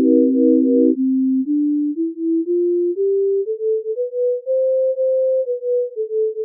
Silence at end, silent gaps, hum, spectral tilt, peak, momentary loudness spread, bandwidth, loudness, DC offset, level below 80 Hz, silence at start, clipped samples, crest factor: 0 s; none; none; -7.5 dB/octave; -4 dBFS; 7 LU; 0.6 kHz; -18 LUFS; under 0.1%; under -90 dBFS; 0 s; under 0.1%; 14 dB